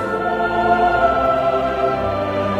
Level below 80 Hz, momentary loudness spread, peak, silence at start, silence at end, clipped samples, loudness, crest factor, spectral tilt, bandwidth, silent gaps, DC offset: -38 dBFS; 5 LU; -4 dBFS; 0 s; 0 s; under 0.1%; -18 LUFS; 14 dB; -7 dB/octave; 8.8 kHz; none; under 0.1%